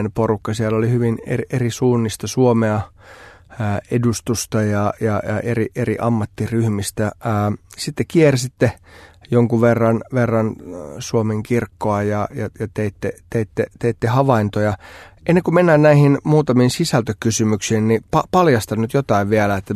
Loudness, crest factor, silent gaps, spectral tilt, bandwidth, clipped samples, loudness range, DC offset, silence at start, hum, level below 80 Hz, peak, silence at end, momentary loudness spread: -18 LUFS; 18 dB; none; -6.5 dB/octave; 13.5 kHz; under 0.1%; 6 LU; under 0.1%; 0 s; none; -48 dBFS; 0 dBFS; 0 s; 9 LU